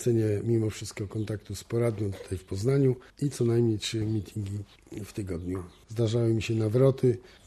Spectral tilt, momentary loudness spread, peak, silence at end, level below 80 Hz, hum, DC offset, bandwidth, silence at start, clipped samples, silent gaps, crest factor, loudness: -7 dB/octave; 13 LU; -10 dBFS; 0.2 s; -56 dBFS; none; under 0.1%; 13 kHz; 0 s; under 0.1%; none; 18 dB; -29 LUFS